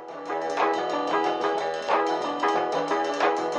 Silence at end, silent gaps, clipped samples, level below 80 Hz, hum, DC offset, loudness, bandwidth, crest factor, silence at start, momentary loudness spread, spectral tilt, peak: 0 s; none; under 0.1%; -74 dBFS; none; under 0.1%; -26 LUFS; 10.5 kHz; 16 dB; 0 s; 4 LU; -3.5 dB/octave; -8 dBFS